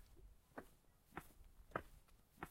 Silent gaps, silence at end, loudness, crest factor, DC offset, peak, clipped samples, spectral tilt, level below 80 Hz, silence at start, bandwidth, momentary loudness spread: none; 0 s; -56 LUFS; 30 dB; under 0.1%; -28 dBFS; under 0.1%; -5.5 dB/octave; -68 dBFS; 0 s; 16 kHz; 17 LU